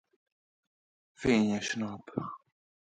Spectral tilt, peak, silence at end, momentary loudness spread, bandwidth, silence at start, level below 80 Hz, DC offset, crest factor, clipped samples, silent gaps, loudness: -5 dB/octave; -14 dBFS; 0.5 s; 15 LU; 9.2 kHz; 1.2 s; -62 dBFS; under 0.1%; 20 dB; under 0.1%; none; -31 LUFS